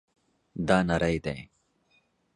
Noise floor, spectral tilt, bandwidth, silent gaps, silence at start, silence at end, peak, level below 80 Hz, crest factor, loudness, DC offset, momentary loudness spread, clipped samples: -69 dBFS; -6.5 dB/octave; 10.5 kHz; none; 0.55 s; 0.9 s; -8 dBFS; -48 dBFS; 22 dB; -27 LUFS; under 0.1%; 16 LU; under 0.1%